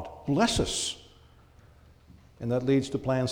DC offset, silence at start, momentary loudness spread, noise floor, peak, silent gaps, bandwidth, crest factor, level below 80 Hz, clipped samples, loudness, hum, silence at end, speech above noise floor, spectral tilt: under 0.1%; 0 s; 9 LU; -56 dBFS; -12 dBFS; none; 17 kHz; 18 dB; -48 dBFS; under 0.1%; -28 LUFS; none; 0 s; 29 dB; -4.5 dB/octave